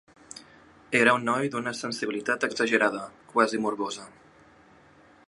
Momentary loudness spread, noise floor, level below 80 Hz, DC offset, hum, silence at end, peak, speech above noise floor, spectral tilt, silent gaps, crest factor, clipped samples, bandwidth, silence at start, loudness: 19 LU; -56 dBFS; -70 dBFS; under 0.1%; none; 1.2 s; -4 dBFS; 30 dB; -4 dB/octave; none; 24 dB; under 0.1%; 11.5 kHz; 0.35 s; -26 LUFS